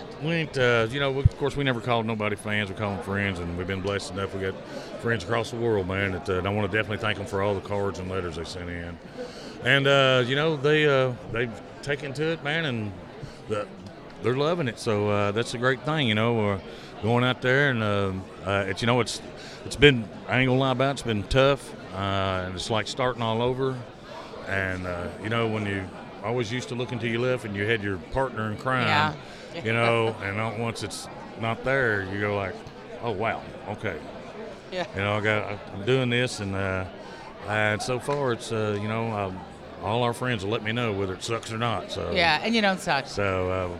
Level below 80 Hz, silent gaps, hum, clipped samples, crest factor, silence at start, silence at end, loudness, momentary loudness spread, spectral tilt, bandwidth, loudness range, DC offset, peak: -48 dBFS; none; none; under 0.1%; 24 dB; 0 s; 0 s; -26 LUFS; 14 LU; -5.5 dB/octave; 13 kHz; 6 LU; under 0.1%; -2 dBFS